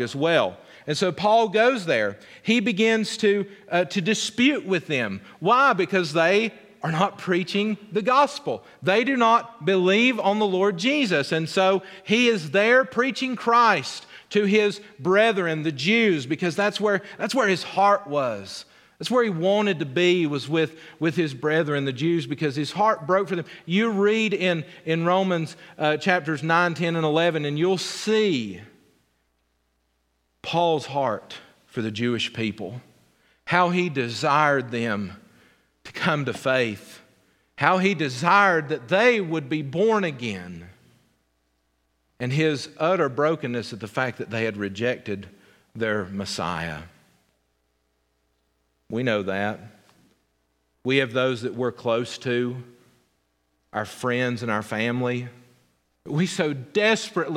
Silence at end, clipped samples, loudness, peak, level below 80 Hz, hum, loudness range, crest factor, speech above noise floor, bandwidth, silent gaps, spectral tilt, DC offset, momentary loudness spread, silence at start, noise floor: 0 s; under 0.1%; -23 LUFS; -2 dBFS; -68 dBFS; none; 8 LU; 22 dB; 48 dB; 15 kHz; none; -5 dB/octave; under 0.1%; 11 LU; 0 s; -71 dBFS